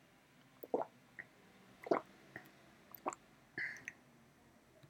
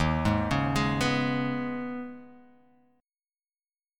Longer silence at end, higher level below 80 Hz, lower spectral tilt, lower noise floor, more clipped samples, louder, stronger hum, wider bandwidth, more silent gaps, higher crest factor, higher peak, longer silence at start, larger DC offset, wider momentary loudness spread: second, 0.05 s vs 1.6 s; second, -84 dBFS vs -44 dBFS; second, -4.5 dB/octave vs -6 dB/octave; second, -67 dBFS vs under -90 dBFS; neither; second, -45 LUFS vs -28 LUFS; neither; about the same, 18 kHz vs 16.5 kHz; neither; first, 28 dB vs 18 dB; second, -18 dBFS vs -12 dBFS; first, 0.6 s vs 0 s; neither; first, 26 LU vs 13 LU